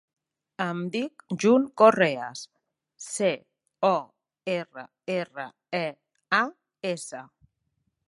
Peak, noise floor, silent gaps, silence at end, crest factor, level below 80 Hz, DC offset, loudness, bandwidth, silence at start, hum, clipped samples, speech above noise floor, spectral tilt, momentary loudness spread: -4 dBFS; -77 dBFS; none; 0.85 s; 24 dB; -76 dBFS; under 0.1%; -26 LUFS; 11.5 kHz; 0.6 s; none; under 0.1%; 51 dB; -4.5 dB/octave; 20 LU